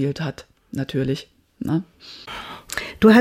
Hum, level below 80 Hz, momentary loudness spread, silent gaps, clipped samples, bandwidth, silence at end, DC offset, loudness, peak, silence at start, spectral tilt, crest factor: none; -50 dBFS; 16 LU; none; under 0.1%; 16.5 kHz; 0 s; under 0.1%; -24 LUFS; -4 dBFS; 0 s; -6.5 dB/octave; 18 dB